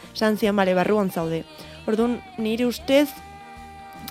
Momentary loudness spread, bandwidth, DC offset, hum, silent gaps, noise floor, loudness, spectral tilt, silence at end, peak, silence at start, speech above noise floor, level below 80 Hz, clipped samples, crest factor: 21 LU; 16.5 kHz; under 0.1%; none; none; -41 dBFS; -23 LUFS; -5.5 dB/octave; 0 s; -4 dBFS; 0 s; 19 dB; -52 dBFS; under 0.1%; 18 dB